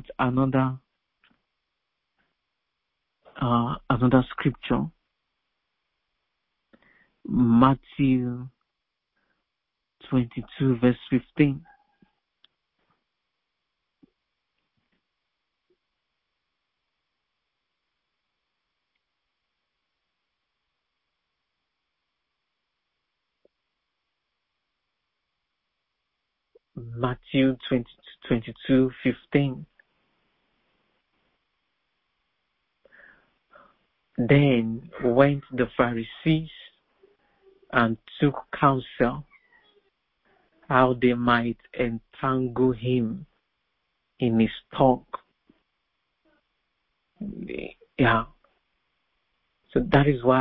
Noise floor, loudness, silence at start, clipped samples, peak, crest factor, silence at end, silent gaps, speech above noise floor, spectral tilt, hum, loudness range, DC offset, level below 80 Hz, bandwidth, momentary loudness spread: -83 dBFS; -24 LUFS; 0.1 s; under 0.1%; -4 dBFS; 24 dB; 0 s; none; 60 dB; -11.5 dB/octave; none; 7 LU; under 0.1%; -52 dBFS; 4.5 kHz; 17 LU